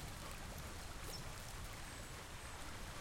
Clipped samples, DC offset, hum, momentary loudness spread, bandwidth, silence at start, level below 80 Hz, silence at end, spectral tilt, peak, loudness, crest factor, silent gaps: under 0.1%; under 0.1%; none; 2 LU; 16.5 kHz; 0 s; -54 dBFS; 0 s; -3 dB/octave; -36 dBFS; -50 LUFS; 14 dB; none